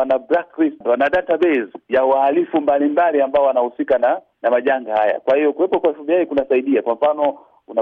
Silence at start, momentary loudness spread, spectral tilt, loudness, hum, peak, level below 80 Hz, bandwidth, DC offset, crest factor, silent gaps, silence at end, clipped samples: 0 s; 5 LU; -7 dB/octave; -17 LUFS; none; -6 dBFS; -58 dBFS; 4.7 kHz; under 0.1%; 12 dB; none; 0 s; under 0.1%